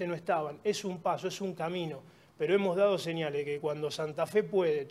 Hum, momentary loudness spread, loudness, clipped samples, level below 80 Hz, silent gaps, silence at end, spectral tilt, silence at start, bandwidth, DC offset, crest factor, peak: none; 8 LU; -32 LUFS; under 0.1%; -78 dBFS; none; 0 s; -5.5 dB/octave; 0 s; 14 kHz; under 0.1%; 16 dB; -16 dBFS